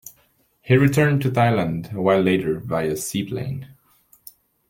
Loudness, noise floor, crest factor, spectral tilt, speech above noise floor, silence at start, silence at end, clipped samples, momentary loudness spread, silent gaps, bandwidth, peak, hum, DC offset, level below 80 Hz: -20 LUFS; -62 dBFS; 18 dB; -6.5 dB/octave; 42 dB; 0.05 s; 0.95 s; under 0.1%; 11 LU; none; 17 kHz; -4 dBFS; none; under 0.1%; -54 dBFS